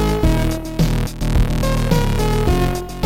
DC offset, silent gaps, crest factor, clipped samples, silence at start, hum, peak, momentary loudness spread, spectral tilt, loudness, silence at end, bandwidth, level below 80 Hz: 1%; none; 14 dB; under 0.1%; 0 s; none; -4 dBFS; 3 LU; -6 dB/octave; -19 LUFS; 0 s; 17 kHz; -20 dBFS